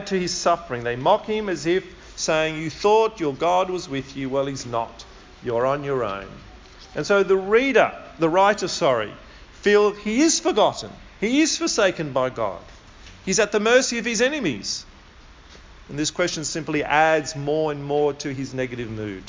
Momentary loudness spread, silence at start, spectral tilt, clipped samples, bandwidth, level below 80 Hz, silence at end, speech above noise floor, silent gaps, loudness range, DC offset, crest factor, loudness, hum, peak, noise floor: 12 LU; 0 s; -3.5 dB/octave; under 0.1%; 7.8 kHz; -50 dBFS; 0 s; 25 dB; none; 5 LU; under 0.1%; 18 dB; -22 LUFS; none; -4 dBFS; -47 dBFS